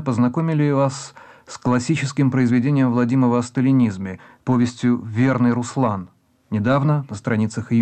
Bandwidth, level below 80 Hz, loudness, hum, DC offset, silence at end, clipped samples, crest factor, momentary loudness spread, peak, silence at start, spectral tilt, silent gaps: 8.8 kHz; -58 dBFS; -19 LUFS; none; under 0.1%; 0 s; under 0.1%; 12 dB; 10 LU; -8 dBFS; 0 s; -7.5 dB/octave; none